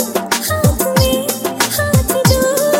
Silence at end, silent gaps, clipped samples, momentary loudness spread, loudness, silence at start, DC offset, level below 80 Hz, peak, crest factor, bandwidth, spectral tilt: 0 s; none; under 0.1%; 4 LU; -14 LUFS; 0 s; under 0.1%; -28 dBFS; 0 dBFS; 14 dB; 17 kHz; -4 dB/octave